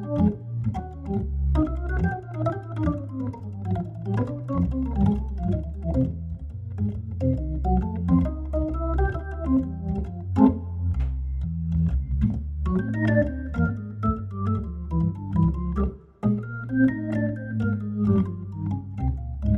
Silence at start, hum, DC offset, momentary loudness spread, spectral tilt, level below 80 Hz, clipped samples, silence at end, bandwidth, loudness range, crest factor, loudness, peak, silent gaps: 0 s; none; under 0.1%; 7 LU; -10.5 dB/octave; -32 dBFS; under 0.1%; 0 s; 4 kHz; 3 LU; 20 dB; -26 LUFS; -4 dBFS; none